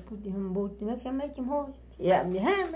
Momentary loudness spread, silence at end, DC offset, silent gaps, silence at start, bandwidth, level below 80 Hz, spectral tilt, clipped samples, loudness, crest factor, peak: 9 LU; 0 s; under 0.1%; none; 0 s; 4 kHz; -52 dBFS; -5.5 dB/octave; under 0.1%; -30 LUFS; 16 dB; -14 dBFS